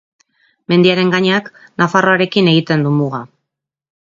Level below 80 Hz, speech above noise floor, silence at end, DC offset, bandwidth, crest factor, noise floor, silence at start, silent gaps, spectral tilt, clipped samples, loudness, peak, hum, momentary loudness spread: -58 dBFS; 65 dB; 0.9 s; under 0.1%; 7.6 kHz; 16 dB; -79 dBFS; 0.7 s; none; -6.5 dB/octave; under 0.1%; -13 LUFS; 0 dBFS; none; 8 LU